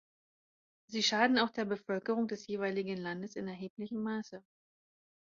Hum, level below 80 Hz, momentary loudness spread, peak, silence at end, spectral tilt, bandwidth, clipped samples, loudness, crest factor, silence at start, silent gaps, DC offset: none; -78 dBFS; 13 LU; -14 dBFS; 0.85 s; -2.5 dB/octave; 7.4 kHz; under 0.1%; -35 LUFS; 22 dB; 0.9 s; 3.70-3.77 s; under 0.1%